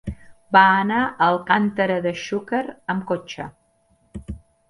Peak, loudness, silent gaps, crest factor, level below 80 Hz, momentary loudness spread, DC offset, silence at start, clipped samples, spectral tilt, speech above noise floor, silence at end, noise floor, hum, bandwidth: 0 dBFS; -20 LUFS; none; 22 dB; -46 dBFS; 22 LU; under 0.1%; 0.05 s; under 0.1%; -6 dB/octave; 42 dB; 0.35 s; -62 dBFS; none; 11 kHz